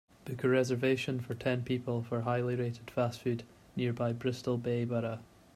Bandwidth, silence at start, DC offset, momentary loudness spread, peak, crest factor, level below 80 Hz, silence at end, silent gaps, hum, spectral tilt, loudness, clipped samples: 14.5 kHz; 0.25 s; under 0.1%; 7 LU; -16 dBFS; 18 dB; -66 dBFS; 0.3 s; none; none; -7 dB/octave; -34 LUFS; under 0.1%